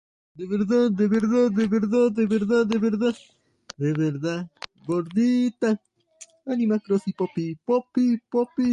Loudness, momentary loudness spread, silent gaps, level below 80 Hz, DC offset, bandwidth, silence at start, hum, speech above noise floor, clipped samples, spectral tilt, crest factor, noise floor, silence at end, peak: -23 LUFS; 9 LU; none; -64 dBFS; under 0.1%; 9.6 kHz; 0.35 s; none; 29 dB; under 0.1%; -7.5 dB/octave; 14 dB; -51 dBFS; 0 s; -10 dBFS